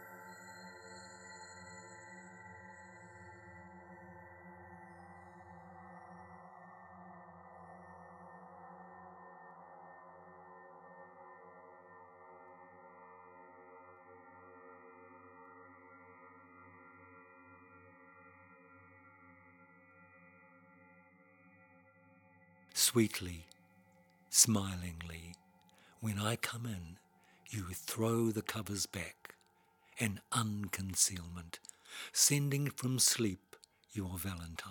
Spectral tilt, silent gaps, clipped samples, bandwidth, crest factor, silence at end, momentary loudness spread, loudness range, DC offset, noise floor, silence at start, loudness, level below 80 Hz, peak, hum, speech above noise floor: -3 dB/octave; none; under 0.1%; 19 kHz; 30 dB; 0 s; 27 LU; 24 LU; under 0.1%; -71 dBFS; 0 s; -35 LUFS; -68 dBFS; -12 dBFS; none; 35 dB